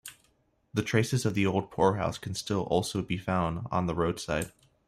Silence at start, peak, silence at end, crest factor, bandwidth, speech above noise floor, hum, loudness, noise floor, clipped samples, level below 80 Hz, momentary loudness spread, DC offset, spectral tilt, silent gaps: 0.05 s; -10 dBFS; 0.4 s; 20 dB; 15.5 kHz; 41 dB; none; -30 LUFS; -70 dBFS; under 0.1%; -54 dBFS; 7 LU; under 0.1%; -5.5 dB/octave; none